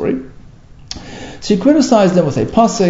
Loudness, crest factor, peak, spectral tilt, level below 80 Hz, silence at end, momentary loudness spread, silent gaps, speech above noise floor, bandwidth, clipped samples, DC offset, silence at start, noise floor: -13 LUFS; 14 dB; 0 dBFS; -6 dB/octave; -40 dBFS; 0 s; 19 LU; none; 27 dB; 8 kHz; under 0.1%; under 0.1%; 0 s; -38 dBFS